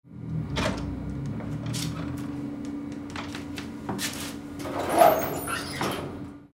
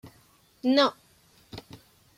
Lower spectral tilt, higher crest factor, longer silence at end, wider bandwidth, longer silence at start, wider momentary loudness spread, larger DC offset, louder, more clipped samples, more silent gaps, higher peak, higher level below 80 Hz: about the same, -5 dB/octave vs -4.5 dB/octave; about the same, 24 dB vs 20 dB; second, 0.05 s vs 0.6 s; about the same, 16 kHz vs 15.5 kHz; about the same, 0.05 s vs 0.05 s; second, 15 LU vs 23 LU; neither; second, -29 LUFS vs -25 LUFS; neither; neither; first, -6 dBFS vs -10 dBFS; first, -46 dBFS vs -66 dBFS